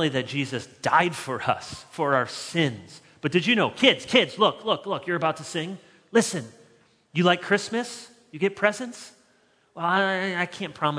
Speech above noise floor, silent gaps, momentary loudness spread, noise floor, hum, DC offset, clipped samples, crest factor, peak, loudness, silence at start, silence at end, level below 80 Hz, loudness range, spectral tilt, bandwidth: 38 dB; none; 14 LU; -63 dBFS; none; under 0.1%; under 0.1%; 24 dB; -2 dBFS; -24 LUFS; 0 s; 0 s; -68 dBFS; 4 LU; -4 dB/octave; 11 kHz